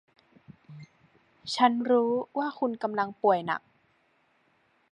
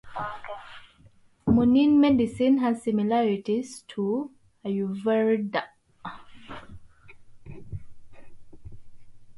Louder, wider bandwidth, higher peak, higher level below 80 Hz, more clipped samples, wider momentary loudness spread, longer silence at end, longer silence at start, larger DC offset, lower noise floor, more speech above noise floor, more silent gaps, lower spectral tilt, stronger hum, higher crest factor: second, -27 LUFS vs -24 LUFS; about the same, 10.5 kHz vs 11.5 kHz; about the same, -8 dBFS vs -8 dBFS; second, -78 dBFS vs -52 dBFS; neither; second, 21 LU vs 24 LU; first, 1.35 s vs 0 s; first, 0.5 s vs 0.05 s; neither; first, -69 dBFS vs -57 dBFS; first, 42 dB vs 33 dB; neither; second, -5 dB/octave vs -7 dB/octave; neither; about the same, 22 dB vs 18 dB